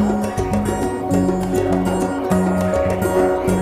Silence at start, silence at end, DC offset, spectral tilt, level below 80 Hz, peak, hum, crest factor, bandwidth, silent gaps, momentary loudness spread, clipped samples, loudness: 0 s; 0 s; under 0.1%; -7 dB/octave; -34 dBFS; -4 dBFS; none; 14 dB; 15.5 kHz; none; 3 LU; under 0.1%; -19 LUFS